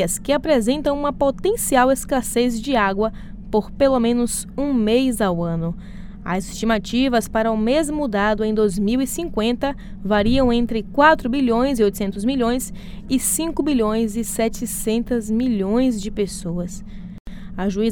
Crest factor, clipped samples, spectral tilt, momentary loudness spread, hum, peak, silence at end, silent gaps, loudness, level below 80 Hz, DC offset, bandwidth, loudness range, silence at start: 18 dB; under 0.1%; -4.5 dB/octave; 9 LU; none; -2 dBFS; 0 s; 17.20-17.25 s; -20 LUFS; -36 dBFS; under 0.1%; 19 kHz; 3 LU; 0 s